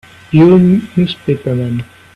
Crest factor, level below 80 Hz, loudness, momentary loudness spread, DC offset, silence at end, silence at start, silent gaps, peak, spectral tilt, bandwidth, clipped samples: 12 dB; -44 dBFS; -12 LUFS; 11 LU; under 0.1%; 0.3 s; 0.3 s; none; 0 dBFS; -9 dB/octave; 5.4 kHz; under 0.1%